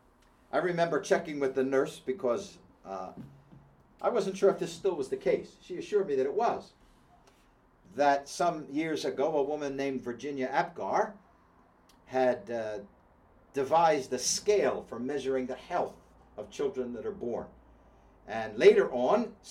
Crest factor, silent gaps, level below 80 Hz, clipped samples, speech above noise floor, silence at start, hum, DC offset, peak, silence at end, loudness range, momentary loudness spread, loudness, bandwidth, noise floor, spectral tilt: 22 dB; none; -66 dBFS; under 0.1%; 33 dB; 0.55 s; none; under 0.1%; -8 dBFS; 0 s; 4 LU; 13 LU; -30 LUFS; 15 kHz; -63 dBFS; -4 dB/octave